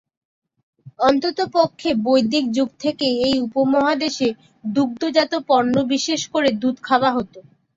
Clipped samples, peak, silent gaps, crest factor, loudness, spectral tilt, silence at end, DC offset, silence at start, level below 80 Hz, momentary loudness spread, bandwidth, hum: under 0.1%; -4 dBFS; none; 16 dB; -19 LUFS; -4 dB/octave; 0.35 s; under 0.1%; 0.85 s; -58 dBFS; 6 LU; 7.8 kHz; none